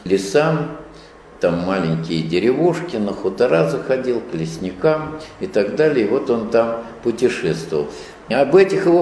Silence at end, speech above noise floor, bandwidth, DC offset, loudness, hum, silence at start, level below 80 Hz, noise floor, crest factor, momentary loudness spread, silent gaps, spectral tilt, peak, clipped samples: 0 s; 24 dB; 11 kHz; under 0.1%; -19 LUFS; none; 0 s; -50 dBFS; -41 dBFS; 16 dB; 10 LU; none; -6.5 dB/octave; -2 dBFS; under 0.1%